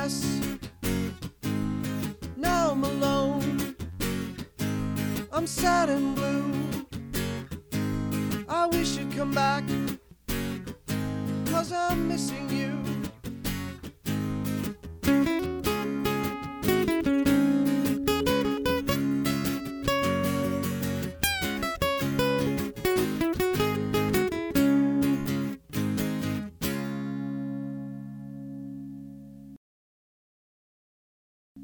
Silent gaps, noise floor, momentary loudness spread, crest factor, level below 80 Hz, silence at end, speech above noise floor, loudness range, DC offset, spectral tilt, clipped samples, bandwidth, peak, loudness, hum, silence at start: 29.57-31.55 s; under -90 dBFS; 11 LU; 22 dB; -46 dBFS; 0 s; over 65 dB; 7 LU; under 0.1%; -5.5 dB/octave; under 0.1%; over 20 kHz; -8 dBFS; -28 LUFS; none; 0 s